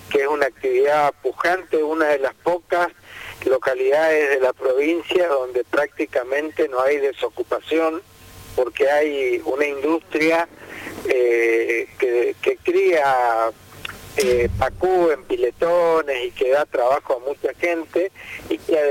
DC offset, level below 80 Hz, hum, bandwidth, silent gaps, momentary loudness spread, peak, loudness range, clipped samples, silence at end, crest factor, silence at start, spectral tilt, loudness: under 0.1%; -48 dBFS; none; 17 kHz; none; 9 LU; -6 dBFS; 2 LU; under 0.1%; 0 s; 14 dB; 0 s; -5 dB/octave; -20 LUFS